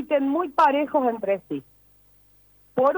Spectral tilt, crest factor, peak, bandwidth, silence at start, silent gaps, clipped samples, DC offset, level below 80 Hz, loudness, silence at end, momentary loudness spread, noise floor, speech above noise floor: -6.5 dB/octave; 16 dB; -8 dBFS; over 20 kHz; 0 s; none; under 0.1%; under 0.1%; -66 dBFS; -23 LUFS; 0 s; 13 LU; -57 dBFS; 35 dB